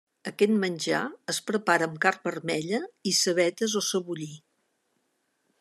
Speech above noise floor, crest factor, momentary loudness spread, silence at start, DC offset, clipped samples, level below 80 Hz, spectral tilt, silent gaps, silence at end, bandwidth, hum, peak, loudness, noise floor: 48 dB; 22 dB; 8 LU; 0.25 s; under 0.1%; under 0.1%; -78 dBFS; -3 dB/octave; none; 1.2 s; 14 kHz; none; -8 dBFS; -27 LUFS; -75 dBFS